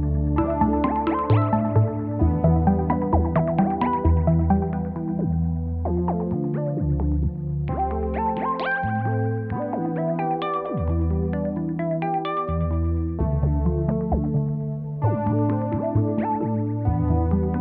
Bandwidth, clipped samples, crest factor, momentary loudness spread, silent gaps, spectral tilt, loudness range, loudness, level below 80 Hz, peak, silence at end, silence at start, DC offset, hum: 4.6 kHz; under 0.1%; 14 dB; 5 LU; none; -12 dB/octave; 4 LU; -23 LUFS; -30 dBFS; -8 dBFS; 0 s; 0 s; under 0.1%; none